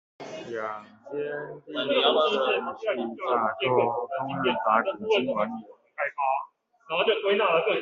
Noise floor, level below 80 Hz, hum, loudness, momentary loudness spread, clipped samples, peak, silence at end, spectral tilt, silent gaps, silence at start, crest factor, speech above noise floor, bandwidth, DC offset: -47 dBFS; -72 dBFS; none; -26 LUFS; 14 LU; under 0.1%; -8 dBFS; 0 s; -1.5 dB/octave; none; 0.2 s; 20 dB; 21 dB; 7.4 kHz; under 0.1%